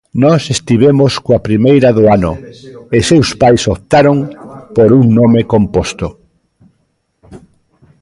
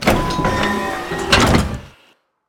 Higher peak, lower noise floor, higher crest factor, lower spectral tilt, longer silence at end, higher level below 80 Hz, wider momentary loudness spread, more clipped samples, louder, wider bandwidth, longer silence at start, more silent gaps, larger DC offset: about the same, 0 dBFS vs 0 dBFS; first, -61 dBFS vs -55 dBFS; second, 10 dB vs 18 dB; first, -6.5 dB/octave vs -4.5 dB/octave; about the same, 0.65 s vs 0.6 s; second, -34 dBFS vs -28 dBFS; about the same, 11 LU vs 11 LU; neither; first, -10 LUFS vs -17 LUFS; second, 11.5 kHz vs 19 kHz; first, 0.15 s vs 0 s; neither; neither